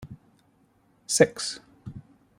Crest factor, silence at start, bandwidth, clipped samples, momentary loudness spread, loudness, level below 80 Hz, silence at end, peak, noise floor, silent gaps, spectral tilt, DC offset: 26 dB; 0 s; 16 kHz; under 0.1%; 26 LU; -24 LUFS; -62 dBFS; 0.4 s; -4 dBFS; -64 dBFS; none; -3 dB/octave; under 0.1%